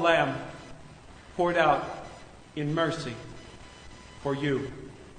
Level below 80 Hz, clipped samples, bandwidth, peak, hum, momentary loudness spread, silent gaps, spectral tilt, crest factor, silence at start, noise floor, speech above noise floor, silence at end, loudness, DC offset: -54 dBFS; under 0.1%; 9.6 kHz; -8 dBFS; none; 24 LU; none; -5.5 dB/octave; 22 dB; 0 s; -49 dBFS; 22 dB; 0 s; -28 LUFS; under 0.1%